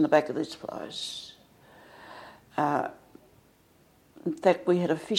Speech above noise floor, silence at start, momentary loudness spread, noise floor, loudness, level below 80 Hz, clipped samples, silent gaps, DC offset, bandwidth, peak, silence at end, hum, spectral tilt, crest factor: 34 dB; 0 s; 22 LU; -61 dBFS; -29 LUFS; -70 dBFS; under 0.1%; none; under 0.1%; 16 kHz; -8 dBFS; 0 s; none; -5.5 dB/octave; 22 dB